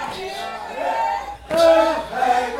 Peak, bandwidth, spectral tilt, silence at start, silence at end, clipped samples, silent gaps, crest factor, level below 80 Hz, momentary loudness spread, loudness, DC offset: -4 dBFS; 16 kHz; -3.5 dB/octave; 0 s; 0 s; under 0.1%; none; 16 dB; -48 dBFS; 14 LU; -20 LUFS; under 0.1%